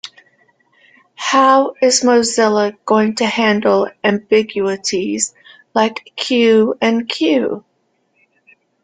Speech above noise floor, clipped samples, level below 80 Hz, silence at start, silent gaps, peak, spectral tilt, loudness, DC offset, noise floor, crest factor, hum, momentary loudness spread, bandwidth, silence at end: 49 dB; under 0.1%; -60 dBFS; 0.05 s; none; 0 dBFS; -3.5 dB/octave; -15 LUFS; under 0.1%; -64 dBFS; 16 dB; none; 9 LU; 9.6 kHz; 1.25 s